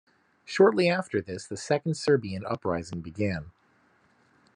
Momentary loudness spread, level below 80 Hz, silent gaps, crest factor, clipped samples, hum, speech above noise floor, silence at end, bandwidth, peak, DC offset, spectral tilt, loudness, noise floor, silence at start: 15 LU; -62 dBFS; none; 20 dB; under 0.1%; none; 38 dB; 1.05 s; 10.5 kHz; -8 dBFS; under 0.1%; -6 dB/octave; -27 LUFS; -65 dBFS; 0.5 s